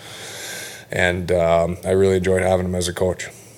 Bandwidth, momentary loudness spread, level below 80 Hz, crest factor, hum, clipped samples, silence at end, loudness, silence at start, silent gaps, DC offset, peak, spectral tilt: 17 kHz; 13 LU; -44 dBFS; 18 dB; none; under 0.1%; 0.1 s; -20 LUFS; 0 s; none; under 0.1%; -2 dBFS; -5 dB/octave